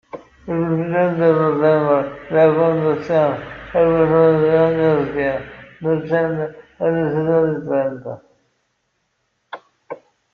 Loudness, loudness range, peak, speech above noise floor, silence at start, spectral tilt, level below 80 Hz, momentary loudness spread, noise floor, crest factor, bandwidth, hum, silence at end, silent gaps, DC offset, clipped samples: -17 LUFS; 7 LU; -2 dBFS; 53 dB; 0.15 s; -9.5 dB/octave; -50 dBFS; 22 LU; -69 dBFS; 16 dB; 5.2 kHz; none; 0.4 s; none; under 0.1%; under 0.1%